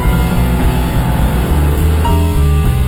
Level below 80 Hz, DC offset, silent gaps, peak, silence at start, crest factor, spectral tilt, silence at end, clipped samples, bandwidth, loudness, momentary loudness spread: -14 dBFS; under 0.1%; none; -2 dBFS; 0 s; 8 dB; -6.5 dB/octave; 0 s; under 0.1%; 18.5 kHz; -13 LUFS; 2 LU